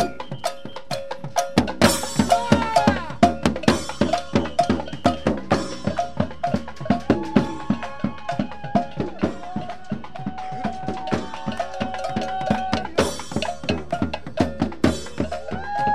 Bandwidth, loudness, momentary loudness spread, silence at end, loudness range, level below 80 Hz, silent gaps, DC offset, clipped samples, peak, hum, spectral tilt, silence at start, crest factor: 15.5 kHz; -24 LUFS; 11 LU; 0 s; 8 LU; -44 dBFS; none; 2%; under 0.1%; 0 dBFS; none; -5 dB/octave; 0 s; 22 dB